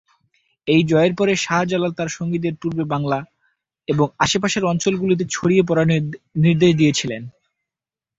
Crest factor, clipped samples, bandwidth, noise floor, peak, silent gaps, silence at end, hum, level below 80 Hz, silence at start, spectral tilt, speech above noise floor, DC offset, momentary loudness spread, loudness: 16 dB; under 0.1%; 8 kHz; -89 dBFS; -2 dBFS; none; 0.9 s; none; -52 dBFS; 0.65 s; -5.5 dB/octave; 70 dB; under 0.1%; 10 LU; -19 LUFS